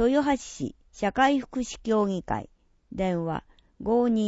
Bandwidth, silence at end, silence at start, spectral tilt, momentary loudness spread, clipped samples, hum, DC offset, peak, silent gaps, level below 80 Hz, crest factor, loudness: 8 kHz; 0 s; 0 s; -5.5 dB/octave; 13 LU; under 0.1%; none; under 0.1%; -8 dBFS; none; -50 dBFS; 18 dB; -27 LUFS